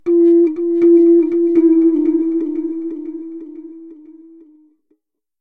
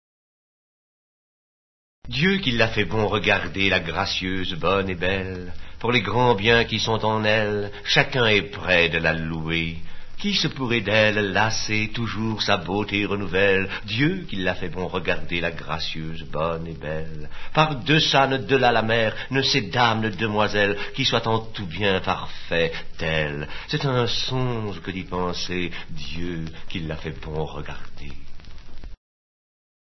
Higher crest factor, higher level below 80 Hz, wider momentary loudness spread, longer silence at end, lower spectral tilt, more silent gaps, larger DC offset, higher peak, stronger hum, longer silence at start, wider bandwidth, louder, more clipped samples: second, 12 dB vs 24 dB; second, -72 dBFS vs -38 dBFS; first, 21 LU vs 13 LU; first, 1.3 s vs 0.85 s; first, -9.5 dB/octave vs -5 dB/octave; neither; first, 0.5% vs under 0.1%; second, -4 dBFS vs 0 dBFS; neither; second, 0.05 s vs 2.05 s; second, 2.5 kHz vs 6.2 kHz; first, -13 LUFS vs -22 LUFS; neither